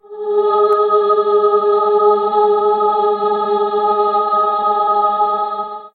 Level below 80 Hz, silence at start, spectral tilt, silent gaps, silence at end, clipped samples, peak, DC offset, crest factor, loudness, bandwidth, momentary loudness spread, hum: -78 dBFS; 0.1 s; -7 dB/octave; none; 0.05 s; under 0.1%; -2 dBFS; under 0.1%; 12 dB; -14 LUFS; 4.5 kHz; 4 LU; none